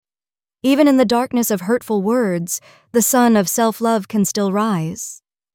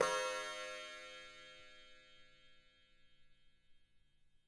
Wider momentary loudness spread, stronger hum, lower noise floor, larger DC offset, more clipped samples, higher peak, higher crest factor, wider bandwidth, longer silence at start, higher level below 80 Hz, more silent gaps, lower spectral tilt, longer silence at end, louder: second, 10 LU vs 24 LU; neither; first, under -90 dBFS vs -70 dBFS; neither; neither; first, -2 dBFS vs -20 dBFS; second, 16 dB vs 28 dB; first, 18 kHz vs 11.5 kHz; first, 0.65 s vs 0 s; first, -60 dBFS vs -76 dBFS; neither; first, -4.5 dB/octave vs -0.5 dB/octave; first, 0.4 s vs 0.2 s; first, -17 LUFS vs -44 LUFS